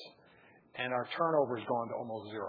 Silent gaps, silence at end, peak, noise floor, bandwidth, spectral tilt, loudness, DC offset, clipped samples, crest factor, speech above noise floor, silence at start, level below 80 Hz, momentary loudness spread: none; 0 s; -16 dBFS; -62 dBFS; 5 kHz; -3.5 dB/octave; -34 LUFS; under 0.1%; under 0.1%; 20 dB; 28 dB; 0 s; -86 dBFS; 13 LU